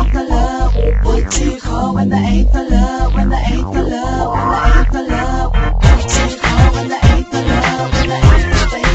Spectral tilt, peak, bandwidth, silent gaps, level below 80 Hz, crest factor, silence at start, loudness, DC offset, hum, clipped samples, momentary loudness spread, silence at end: -5.5 dB/octave; 0 dBFS; 8.2 kHz; none; -14 dBFS; 12 dB; 0 s; -14 LUFS; under 0.1%; none; 0.1%; 5 LU; 0 s